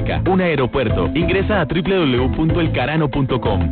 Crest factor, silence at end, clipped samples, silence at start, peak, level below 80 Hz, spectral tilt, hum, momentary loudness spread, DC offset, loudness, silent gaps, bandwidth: 10 dB; 0 s; under 0.1%; 0 s; -8 dBFS; -30 dBFS; -12 dB/octave; none; 2 LU; under 0.1%; -17 LUFS; none; 4.5 kHz